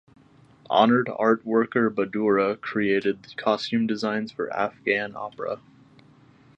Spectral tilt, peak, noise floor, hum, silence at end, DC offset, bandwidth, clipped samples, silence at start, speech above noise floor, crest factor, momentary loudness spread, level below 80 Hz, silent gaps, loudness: -6.5 dB/octave; -4 dBFS; -54 dBFS; none; 1 s; under 0.1%; 8 kHz; under 0.1%; 0.7 s; 31 dB; 20 dB; 11 LU; -68 dBFS; none; -24 LUFS